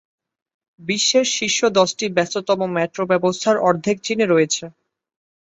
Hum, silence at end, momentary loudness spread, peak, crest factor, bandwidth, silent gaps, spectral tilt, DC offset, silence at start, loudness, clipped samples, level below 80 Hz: none; 0.75 s; 6 LU; -2 dBFS; 18 dB; 8.2 kHz; none; -3 dB/octave; under 0.1%; 0.8 s; -18 LUFS; under 0.1%; -64 dBFS